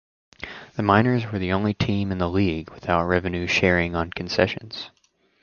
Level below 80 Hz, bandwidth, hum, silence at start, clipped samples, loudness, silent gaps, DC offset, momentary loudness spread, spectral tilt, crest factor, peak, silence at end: -42 dBFS; 7.2 kHz; none; 0.4 s; under 0.1%; -23 LUFS; none; under 0.1%; 16 LU; -6.5 dB/octave; 22 dB; -2 dBFS; 0.55 s